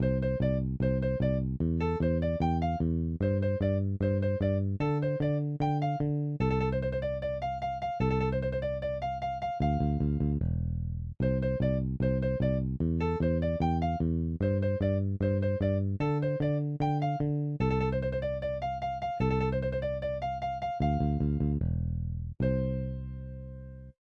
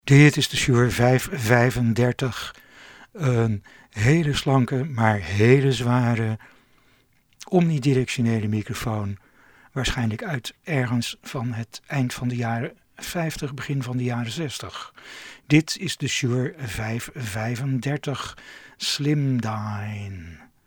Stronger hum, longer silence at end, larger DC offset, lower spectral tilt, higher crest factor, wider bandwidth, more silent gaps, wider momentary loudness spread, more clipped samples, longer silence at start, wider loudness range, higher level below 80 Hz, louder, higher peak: neither; about the same, 0.25 s vs 0.3 s; neither; first, -10 dB/octave vs -5.5 dB/octave; second, 12 dB vs 22 dB; second, 6.8 kHz vs 18 kHz; neither; second, 5 LU vs 15 LU; neither; about the same, 0 s vs 0.05 s; second, 2 LU vs 6 LU; first, -40 dBFS vs -46 dBFS; second, -30 LUFS vs -23 LUFS; second, -16 dBFS vs 0 dBFS